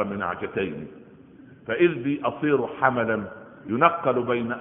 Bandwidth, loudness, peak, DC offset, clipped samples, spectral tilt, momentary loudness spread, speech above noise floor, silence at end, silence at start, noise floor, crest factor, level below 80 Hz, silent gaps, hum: 3.8 kHz; -24 LUFS; -2 dBFS; under 0.1%; under 0.1%; -2 dB/octave; 17 LU; 25 dB; 0 s; 0 s; -49 dBFS; 22 dB; -62 dBFS; none; none